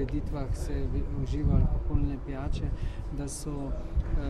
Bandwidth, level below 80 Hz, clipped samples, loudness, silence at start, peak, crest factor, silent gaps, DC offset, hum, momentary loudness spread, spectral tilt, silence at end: 12.5 kHz; -30 dBFS; under 0.1%; -33 LUFS; 0 s; -12 dBFS; 16 dB; none; under 0.1%; none; 8 LU; -7 dB/octave; 0 s